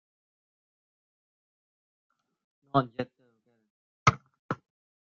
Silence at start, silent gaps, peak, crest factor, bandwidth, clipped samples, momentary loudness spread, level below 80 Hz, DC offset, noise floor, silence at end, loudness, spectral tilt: 2.75 s; 3.70-4.06 s, 4.39-4.49 s; -6 dBFS; 28 dB; 7.2 kHz; under 0.1%; 14 LU; -62 dBFS; under 0.1%; -69 dBFS; 0.5 s; -30 LUFS; -4.5 dB/octave